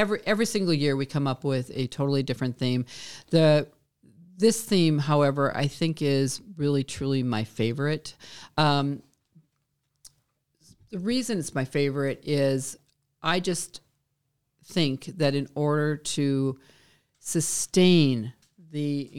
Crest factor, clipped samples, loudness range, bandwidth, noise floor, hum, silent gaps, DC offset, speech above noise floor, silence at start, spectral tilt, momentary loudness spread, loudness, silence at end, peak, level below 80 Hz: 18 dB; under 0.1%; 6 LU; 16 kHz; -77 dBFS; none; none; 0.3%; 51 dB; 0 s; -5.5 dB/octave; 11 LU; -26 LUFS; 0 s; -8 dBFS; -62 dBFS